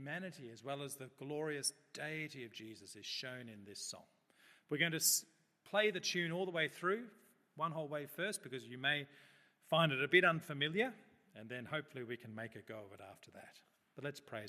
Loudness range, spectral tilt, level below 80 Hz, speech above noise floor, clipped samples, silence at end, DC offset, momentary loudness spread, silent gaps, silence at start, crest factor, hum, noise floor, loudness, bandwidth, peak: 9 LU; -3 dB/octave; -88 dBFS; 29 dB; under 0.1%; 0 s; under 0.1%; 19 LU; none; 0 s; 26 dB; none; -69 dBFS; -39 LUFS; 14.5 kHz; -16 dBFS